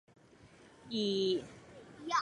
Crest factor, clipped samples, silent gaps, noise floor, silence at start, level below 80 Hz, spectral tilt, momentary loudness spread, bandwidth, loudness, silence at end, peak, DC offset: 18 dB; under 0.1%; none; -60 dBFS; 0.45 s; -72 dBFS; -4.5 dB/octave; 22 LU; 11 kHz; -35 LUFS; 0 s; -20 dBFS; under 0.1%